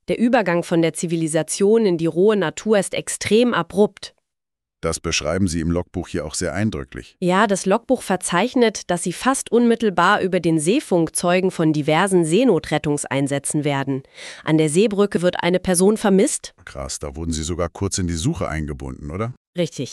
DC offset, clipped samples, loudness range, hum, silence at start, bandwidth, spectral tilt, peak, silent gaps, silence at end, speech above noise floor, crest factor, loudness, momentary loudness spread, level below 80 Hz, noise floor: under 0.1%; under 0.1%; 5 LU; none; 0.1 s; 13.5 kHz; -5 dB/octave; -4 dBFS; 19.37-19.53 s; 0 s; 66 dB; 16 dB; -20 LUFS; 11 LU; -42 dBFS; -86 dBFS